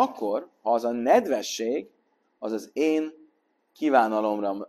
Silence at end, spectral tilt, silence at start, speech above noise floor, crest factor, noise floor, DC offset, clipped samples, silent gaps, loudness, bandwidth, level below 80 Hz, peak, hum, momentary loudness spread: 0.05 s; -4 dB/octave; 0 s; 43 dB; 20 dB; -68 dBFS; under 0.1%; under 0.1%; none; -25 LUFS; 13 kHz; -76 dBFS; -6 dBFS; none; 11 LU